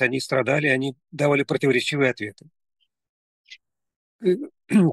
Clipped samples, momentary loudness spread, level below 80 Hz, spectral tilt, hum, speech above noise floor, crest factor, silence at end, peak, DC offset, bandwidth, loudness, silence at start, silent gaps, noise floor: under 0.1%; 8 LU; -72 dBFS; -6 dB/octave; none; 28 dB; 20 dB; 0 s; -4 dBFS; under 0.1%; 12.5 kHz; -22 LUFS; 0 s; 3.09-3.44 s, 3.96-4.19 s; -51 dBFS